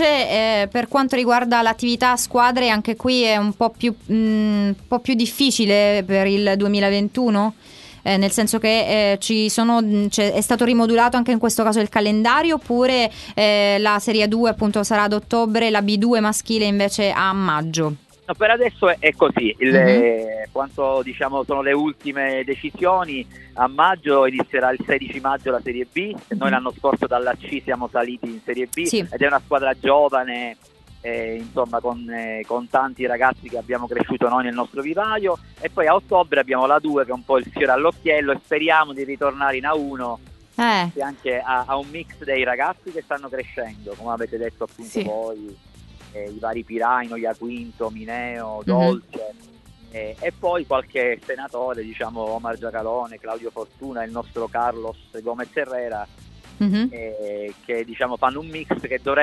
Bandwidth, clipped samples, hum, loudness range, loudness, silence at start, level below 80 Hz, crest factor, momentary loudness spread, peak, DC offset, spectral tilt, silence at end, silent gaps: 12 kHz; under 0.1%; none; 9 LU; -20 LUFS; 0 s; -50 dBFS; 20 dB; 13 LU; 0 dBFS; under 0.1%; -4.5 dB/octave; 0 s; none